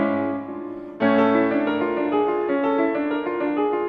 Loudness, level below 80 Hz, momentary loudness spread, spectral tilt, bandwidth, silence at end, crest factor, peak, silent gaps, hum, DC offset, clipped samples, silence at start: -22 LUFS; -60 dBFS; 10 LU; -8.5 dB/octave; 5 kHz; 0 s; 14 dB; -8 dBFS; none; none; under 0.1%; under 0.1%; 0 s